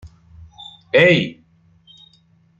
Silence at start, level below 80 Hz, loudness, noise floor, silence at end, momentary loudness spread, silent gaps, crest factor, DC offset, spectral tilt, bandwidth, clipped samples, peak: 0.05 s; -54 dBFS; -15 LUFS; -56 dBFS; 1.25 s; 26 LU; none; 20 dB; under 0.1%; -6 dB/octave; 7.6 kHz; under 0.1%; -2 dBFS